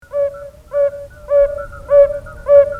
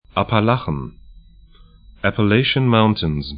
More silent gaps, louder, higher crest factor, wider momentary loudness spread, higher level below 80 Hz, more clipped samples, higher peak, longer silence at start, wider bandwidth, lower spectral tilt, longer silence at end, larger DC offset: neither; first, -15 LUFS vs -18 LUFS; about the same, 14 dB vs 18 dB; first, 15 LU vs 11 LU; about the same, -38 dBFS vs -40 dBFS; neither; about the same, 0 dBFS vs 0 dBFS; about the same, 0.1 s vs 0.15 s; second, 3 kHz vs 5.2 kHz; second, -6.5 dB/octave vs -11.5 dB/octave; about the same, 0 s vs 0 s; neither